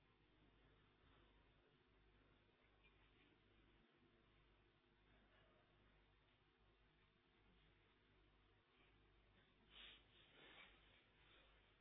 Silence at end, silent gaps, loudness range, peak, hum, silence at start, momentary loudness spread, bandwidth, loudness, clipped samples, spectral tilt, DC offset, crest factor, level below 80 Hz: 0 s; none; 0 LU; -52 dBFS; 50 Hz at -80 dBFS; 0 s; 5 LU; 4.2 kHz; -66 LUFS; under 0.1%; -2 dB/octave; under 0.1%; 22 dB; -82 dBFS